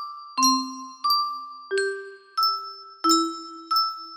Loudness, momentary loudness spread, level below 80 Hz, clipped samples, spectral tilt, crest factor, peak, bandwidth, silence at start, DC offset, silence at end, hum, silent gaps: -24 LUFS; 14 LU; -80 dBFS; under 0.1%; 0.5 dB/octave; 20 dB; -6 dBFS; 15.5 kHz; 0 s; under 0.1%; 0 s; none; none